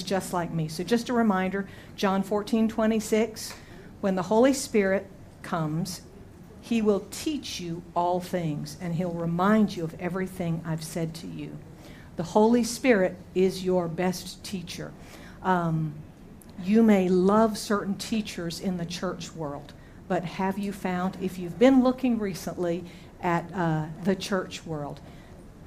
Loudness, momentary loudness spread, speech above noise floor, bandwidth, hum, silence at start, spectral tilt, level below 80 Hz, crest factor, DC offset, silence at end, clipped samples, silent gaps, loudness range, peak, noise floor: -27 LUFS; 17 LU; 20 dB; 15.5 kHz; none; 0 s; -6 dB/octave; -54 dBFS; 20 dB; under 0.1%; 0 s; under 0.1%; none; 5 LU; -6 dBFS; -47 dBFS